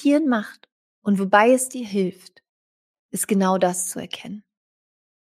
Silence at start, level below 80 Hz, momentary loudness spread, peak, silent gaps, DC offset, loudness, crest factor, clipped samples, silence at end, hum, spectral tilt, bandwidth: 0 s; -72 dBFS; 17 LU; -2 dBFS; 0.72-1.02 s, 2.49-3.09 s; under 0.1%; -21 LUFS; 20 dB; under 0.1%; 0.95 s; none; -4.5 dB/octave; 15.5 kHz